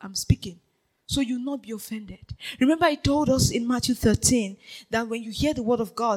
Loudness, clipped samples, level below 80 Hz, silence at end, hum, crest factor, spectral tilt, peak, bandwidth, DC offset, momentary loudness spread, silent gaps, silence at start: -24 LUFS; under 0.1%; -42 dBFS; 0 s; none; 20 dB; -4.5 dB/octave; -6 dBFS; 17 kHz; under 0.1%; 16 LU; none; 0 s